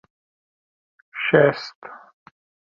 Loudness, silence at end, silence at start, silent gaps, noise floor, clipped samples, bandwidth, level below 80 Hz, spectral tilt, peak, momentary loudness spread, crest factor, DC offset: -19 LUFS; 0.75 s; 1.15 s; 1.75-1.82 s; under -90 dBFS; under 0.1%; 7 kHz; -66 dBFS; -7 dB/octave; -2 dBFS; 25 LU; 22 dB; under 0.1%